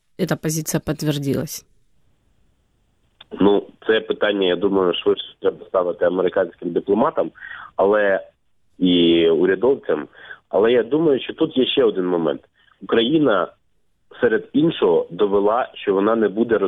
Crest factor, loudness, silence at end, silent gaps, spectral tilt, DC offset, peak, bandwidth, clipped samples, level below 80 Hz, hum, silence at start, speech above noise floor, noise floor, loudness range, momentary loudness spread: 18 dB; -19 LUFS; 0 s; none; -5.5 dB/octave; under 0.1%; -2 dBFS; 16 kHz; under 0.1%; -56 dBFS; none; 0.2 s; 45 dB; -64 dBFS; 5 LU; 8 LU